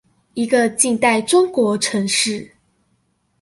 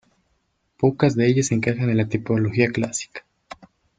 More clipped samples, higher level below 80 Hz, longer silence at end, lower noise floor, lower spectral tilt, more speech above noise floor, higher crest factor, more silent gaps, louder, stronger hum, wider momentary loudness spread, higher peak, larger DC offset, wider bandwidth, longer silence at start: neither; second, -62 dBFS vs -56 dBFS; first, 0.95 s vs 0.8 s; second, -65 dBFS vs -69 dBFS; second, -3 dB/octave vs -6 dB/octave; about the same, 48 dB vs 49 dB; about the same, 18 dB vs 20 dB; neither; first, -17 LUFS vs -21 LUFS; neither; about the same, 9 LU vs 9 LU; about the same, 0 dBFS vs -2 dBFS; neither; first, 12 kHz vs 9.4 kHz; second, 0.35 s vs 0.8 s